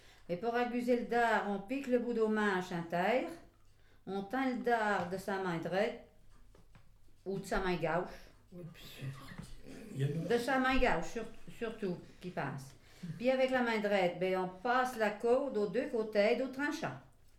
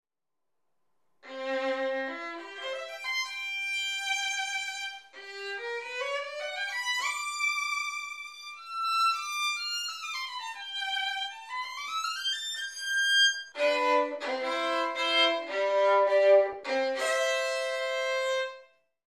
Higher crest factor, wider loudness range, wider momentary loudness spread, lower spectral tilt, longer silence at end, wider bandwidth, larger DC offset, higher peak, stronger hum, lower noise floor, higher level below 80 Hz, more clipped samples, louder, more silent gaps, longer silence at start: about the same, 20 dB vs 20 dB; about the same, 7 LU vs 7 LU; first, 18 LU vs 13 LU; first, -6 dB/octave vs 1.5 dB/octave; about the same, 0.35 s vs 0.4 s; about the same, 15.5 kHz vs 15 kHz; neither; second, -16 dBFS vs -12 dBFS; neither; second, -62 dBFS vs -85 dBFS; first, -54 dBFS vs -86 dBFS; neither; second, -35 LUFS vs -29 LUFS; neither; second, 0.05 s vs 1.25 s